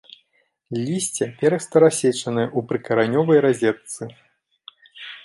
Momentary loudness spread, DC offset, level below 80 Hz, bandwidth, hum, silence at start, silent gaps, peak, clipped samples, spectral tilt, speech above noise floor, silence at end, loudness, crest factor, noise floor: 17 LU; under 0.1%; -68 dBFS; 11.5 kHz; none; 0.7 s; none; -2 dBFS; under 0.1%; -5 dB/octave; 47 dB; 0.05 s; -20 LUFS; 18 dB; -67 dBFS